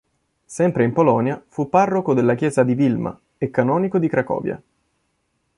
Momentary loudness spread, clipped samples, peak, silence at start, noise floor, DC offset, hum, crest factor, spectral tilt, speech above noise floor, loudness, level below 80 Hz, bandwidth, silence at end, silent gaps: 11 LU; under 0.1%; -2 dBFS; 0.5 s; -70 dBFS; under 0.1%; none; 18 dB; -8 dB/octave; 51 dB; -19 LUFS; -56 dBFS; 11.5 kHz; 1 s; none